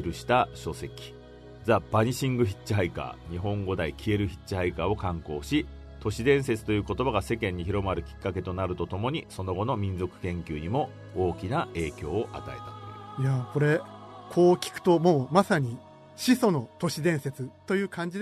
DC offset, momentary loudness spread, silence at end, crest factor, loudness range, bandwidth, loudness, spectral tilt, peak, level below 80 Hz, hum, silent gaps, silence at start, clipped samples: under 0.1%; 14 LU; 0 s; 22 dB; 6 LU; 13.5 kHz; -28 LUFS; -6.5 dB/octave; -6 dBFS; -48 dBFS; none; none; 0 s; under 0.1%